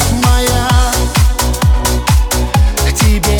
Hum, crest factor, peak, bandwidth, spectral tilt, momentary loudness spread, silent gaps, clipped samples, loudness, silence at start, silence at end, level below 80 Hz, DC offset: none; 10 dB; 0 dBFS; 19.5 kHz; -4.5 dB/octave; 2 LU; none; under 0.1%; -12 LUFS; 0 s; 0 s; -14 dBFS; under 0.1%